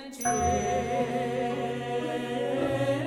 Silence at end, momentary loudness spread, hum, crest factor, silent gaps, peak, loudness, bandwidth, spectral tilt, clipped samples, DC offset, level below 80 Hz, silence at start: 0 s; 5 LU; none; 14 dB; none; -14 dBFS; -29 LUFS; 17 kHz; -4.5 dB/octave; under 0.1%; under 0.1%; -50 dBFS; 0 s